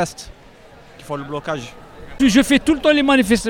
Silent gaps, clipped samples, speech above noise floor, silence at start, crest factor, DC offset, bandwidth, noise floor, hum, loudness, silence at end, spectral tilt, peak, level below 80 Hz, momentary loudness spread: none; under 0.1%; 27 dB; 0 s; 18 dB; under 0.1%; 17 kHz; -44 dBFS; none; -17 LUFS; 0 s; -4 dB/octave; 0 dBFS; -40 dBFS; 16 LU